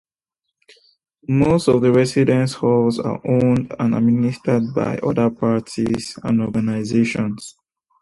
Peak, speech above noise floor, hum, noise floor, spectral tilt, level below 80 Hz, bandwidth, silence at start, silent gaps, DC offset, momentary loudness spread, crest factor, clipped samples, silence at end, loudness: -2 dBFS; 63 dB; none; -80 dBFS; -7 dB/octave; -50 dBFS; 11.5 kHz; 1.3 s; none; under 0.1%; 8 LU; 16 dB; under 0.1%; 0.5 s; -19 LUFS